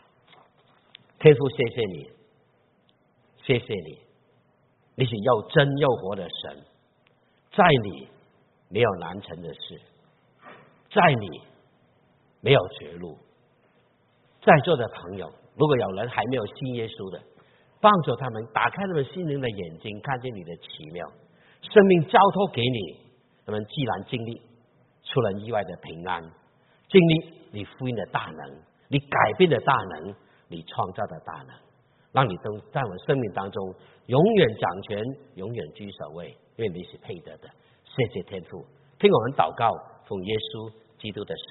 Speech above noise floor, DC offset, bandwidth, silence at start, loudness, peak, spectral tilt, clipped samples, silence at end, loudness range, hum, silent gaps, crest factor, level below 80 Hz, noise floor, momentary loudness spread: 40 dB; under 0.1%; 4.2 kHz; 1.2 s; -24 LUFS; 0 dBFS; -4.5 dB/octave; under 0.1%; 0.1 s; 8 LU; none; none; 26 dB; -60 dBFS; -64 dBFS; 21 LU